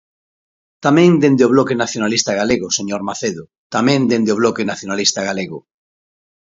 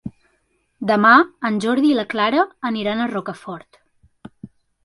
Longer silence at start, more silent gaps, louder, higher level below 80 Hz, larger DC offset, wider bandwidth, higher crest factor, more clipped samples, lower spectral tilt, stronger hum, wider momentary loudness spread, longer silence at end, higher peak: first, 0.8 s vs 0.05 s; first, 3.58-3.70 s vs none; about the same, -16 LUFS vs -18 LUFS; about the same, -56 dBFS vs -60 dBFS; neither; second, 7.8 kHz vs 11.5 kHz; about the same, 16 dB vs 20 dB; neither; about the same, -4.5 dB/octave vs -5.5 dB/octave; neither; second, 12 LU vs 21 LU; first, 1 s vs 0.4 s; about the same, 0 dBFS vs 0 dBFS